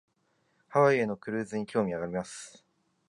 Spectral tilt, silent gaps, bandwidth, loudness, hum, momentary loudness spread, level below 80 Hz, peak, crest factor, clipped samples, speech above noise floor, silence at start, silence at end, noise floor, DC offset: -6 dB/octave; none; 11.5 kHz; -29 LUFS; none; 17 LU; -68 dBFS; -10 dBFS; 20 dB; under 0.1%; 44 dB; 0.7 s; 0.6 s; -73 dBFS; under 0.1%